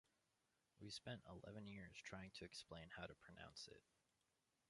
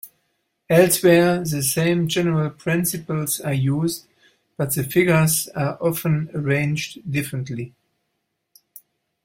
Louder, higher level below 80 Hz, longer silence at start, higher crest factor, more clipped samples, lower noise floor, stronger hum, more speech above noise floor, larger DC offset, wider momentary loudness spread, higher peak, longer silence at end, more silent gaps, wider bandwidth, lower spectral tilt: second, -58 LUFS vs -20 LUFS; second, -76 dBFS vs -56 dBFS; first, 0.75 s vs 0.05 s; about the same, 20 dB vs 18 dB; neither; first, -88 dBFS vs -75 dBFS; neither; second, 30 dB vs 55 dB; neither; second, 5 LU vs 11 LU; second, -40 dBFS vs -2 dBFS; second, 0.9 s vs 1.55 s; neither; second, 11.5 kHz vs 16.5 kHz; about the same, -4 dB/octave vs -5 dB/octave